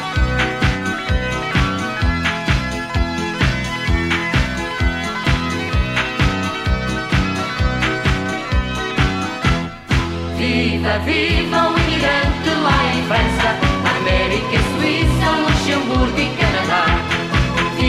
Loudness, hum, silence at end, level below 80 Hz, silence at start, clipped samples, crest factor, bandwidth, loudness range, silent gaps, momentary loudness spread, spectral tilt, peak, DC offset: -18 LUFS; none; 0 s; -24 dBFS; 0 s; under 0.1%; 16 dB; 13.5 kHz; 3 LU; none; 5 LU; -5.5 dB/octave; -2 dBFS; under 0.1%